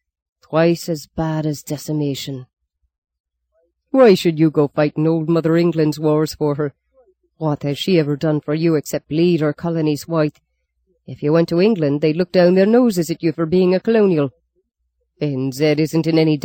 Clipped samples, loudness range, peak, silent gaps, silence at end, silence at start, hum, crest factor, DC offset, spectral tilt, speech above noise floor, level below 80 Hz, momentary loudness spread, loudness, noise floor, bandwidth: under 0.1%; 4 LU; -2 dBFS; 2.98-3.02 s, 3.20-3.24 s; 0.05 s; 0.5 s; none; 16 dB; under 0.1%; -7 dB/octave; 54 dB; -56 dBFS; 10 LU; -17 LUFS; -71 dBFS; 17 kHz